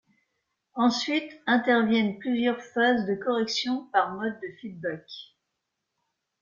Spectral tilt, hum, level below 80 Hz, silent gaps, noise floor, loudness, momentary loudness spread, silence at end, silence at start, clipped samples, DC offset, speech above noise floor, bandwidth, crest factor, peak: -4.5 dB/octave; none; -72 dBFS; none; -82 dBFS; -26 LUFS; 16 LU; 1.15 s; 0.75 s; under 0.1%; under 0.1%; 56 dB; 7.4 kHz; 20 dB; -8 dBFS